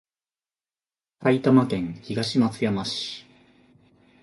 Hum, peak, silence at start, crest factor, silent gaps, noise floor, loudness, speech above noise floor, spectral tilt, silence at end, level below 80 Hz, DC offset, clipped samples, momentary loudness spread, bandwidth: none; -6 dBFS; 1.2 s; 20 dB; none; under -90 dBFS; -24 LUFS; over 67 dB; -6 dB/octave; 1 s; -60 dBFS; under 0.1%; under 0.1%; 11 LU; 11.5 kHz